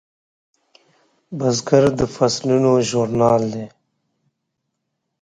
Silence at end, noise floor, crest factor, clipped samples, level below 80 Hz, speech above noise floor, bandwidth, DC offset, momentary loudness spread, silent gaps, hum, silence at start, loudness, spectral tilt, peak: 1.55 s; -76 dBFS; 20 dB; under 0.1%; -50 dBFS; 59 dB; 9.6 kHz; under 0.1%; 13 LU; none; none; 1.3 s; -18 LUFS; -5.5 dB/octave; 0 dBFS